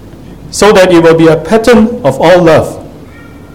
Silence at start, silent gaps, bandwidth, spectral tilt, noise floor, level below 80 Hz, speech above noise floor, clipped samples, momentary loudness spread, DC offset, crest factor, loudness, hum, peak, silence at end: 0.05 s; none; 16.5 kHz; -5.5 dB/octave; -30 dBFS; -32 dBFS; 25 dB; 4%; 10 LU; 0.8%; 6 dB; -6 LUFS; none; 0 dBFS; 0.5 s